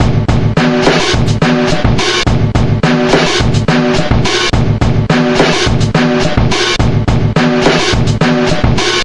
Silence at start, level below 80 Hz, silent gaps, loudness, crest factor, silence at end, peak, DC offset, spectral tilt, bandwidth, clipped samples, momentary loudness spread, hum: 0 s; -22 dBFS; none; -11 LUFS; 10 dB; 0 s; 0 dBFS; 3%; -5.5 dB/octave; 11 kHz; under 0.1%; 2 LU; none